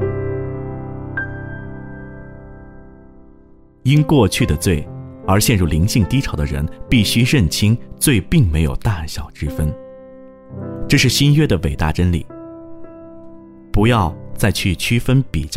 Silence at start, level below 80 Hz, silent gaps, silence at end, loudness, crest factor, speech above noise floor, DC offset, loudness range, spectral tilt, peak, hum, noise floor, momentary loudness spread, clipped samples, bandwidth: 0 s; -30 dBFS; none; 0 s; -17 LUFS; 16 dB; 30 dB; under 0.1%; 5 LU; -5.5 dB/octave; -2 dBFS; none; -45 dBFS; 21 LU; under 0.1%; 16 kHz